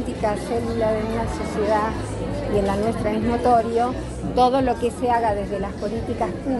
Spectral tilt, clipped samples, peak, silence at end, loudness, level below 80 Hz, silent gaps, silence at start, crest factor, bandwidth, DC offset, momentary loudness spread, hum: -6.5 dB/octave; under 0.1%; -6 dBFS; 0 s; -22 LUFS; -36 dBFS; none; 0 s; 16 dB; 11.5 kHz; under 0.1%; 8 LU; none